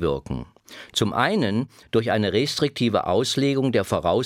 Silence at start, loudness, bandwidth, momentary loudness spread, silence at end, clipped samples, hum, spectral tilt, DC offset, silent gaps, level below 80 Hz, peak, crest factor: 0 s; -23 LUFS; 16.5 kHz; 9 LU; 0 s; under 0.1%; none; -5 dB/octave; under 0.1%; none; -48 dBFS; -4 dBFS; 18 dB